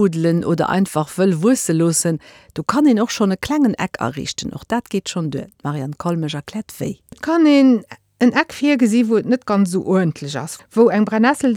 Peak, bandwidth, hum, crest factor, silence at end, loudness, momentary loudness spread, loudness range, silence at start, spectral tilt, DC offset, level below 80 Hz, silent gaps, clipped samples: -2 dBFS; 18 kHz; none; 16 dB; 0 s; -18 LUFS; 12 LU; 6 LU; 0 s; -5.5 dB/octave; under 0.1%; -54 dBFS; none; under 0.1%